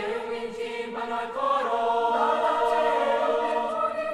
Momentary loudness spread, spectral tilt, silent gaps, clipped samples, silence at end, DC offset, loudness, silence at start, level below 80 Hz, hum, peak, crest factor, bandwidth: 9 LU; -3.5 dB/octave; none; under 0.1%; 0 s; under 0.1%; -26 LUFS; 0 s; -62 dBFS; none; -10 dBFS; 14 dB; 12.5 kHz